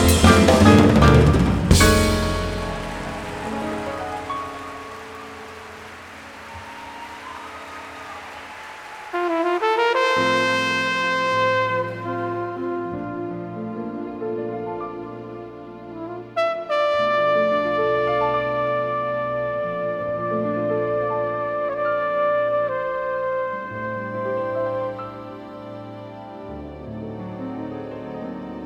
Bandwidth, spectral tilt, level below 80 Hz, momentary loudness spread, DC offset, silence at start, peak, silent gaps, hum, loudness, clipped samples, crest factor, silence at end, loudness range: 19.5 kHz; -5.5 dB/octave; -34 dBFS; 20 LU; under 0.1%; 0 s; 0 dBFS; none; none; -21 LUFS; under 0.1%; 22 dB; 0 s; 13 LU